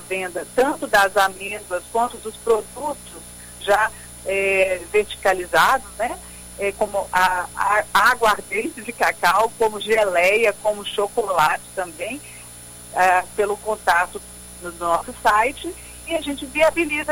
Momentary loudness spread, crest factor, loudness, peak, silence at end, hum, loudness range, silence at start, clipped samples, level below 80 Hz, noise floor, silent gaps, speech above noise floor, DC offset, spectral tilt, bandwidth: 16 LU; 18 dB; -20 LUFS; -2 dBFS; 0 s; 60 Hz at -50 dBFS; 4 LU; 0 s; under 0.1%; -48 dBFS; -40 dBFS; none; 19 dB; under 0.1%; -2.5 dB/octave; 17 kHz